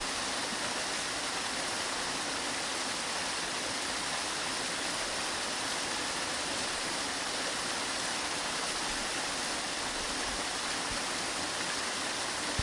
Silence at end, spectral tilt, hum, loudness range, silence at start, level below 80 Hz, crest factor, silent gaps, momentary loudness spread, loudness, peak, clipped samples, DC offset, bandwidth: 0 s; -1 dB/octave; none; 0 LU; 0 s; -58 dBFS; 18 dB; none; 1 LU; -32 LUFS; -16 dBFS; under 0.1%; under 0.1%; 12 kHz